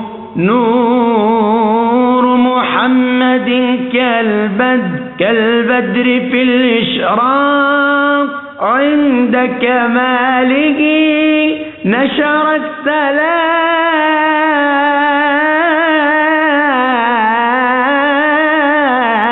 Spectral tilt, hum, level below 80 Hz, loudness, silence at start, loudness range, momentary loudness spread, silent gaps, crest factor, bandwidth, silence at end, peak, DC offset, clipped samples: -2.5 dB/octave; none; -58 dBFS; -11 LUFS; 0 s; 1 LU; 3 LU; none; 12 dB; 4.2 kHz; 0 s; 0 dBFS; 0.2%; under 0.1%